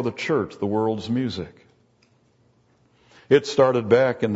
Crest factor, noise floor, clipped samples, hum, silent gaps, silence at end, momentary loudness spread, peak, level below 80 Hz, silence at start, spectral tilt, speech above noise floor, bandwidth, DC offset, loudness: 20 dB; -61 dBFS; under 0.1%; none; none; 0 s; 10 LU; -4 dBFS; -60 dBFS; 0 s; -6 dB/octave; 40 dB; 8 kHz; under 0.1%; -21 LUFS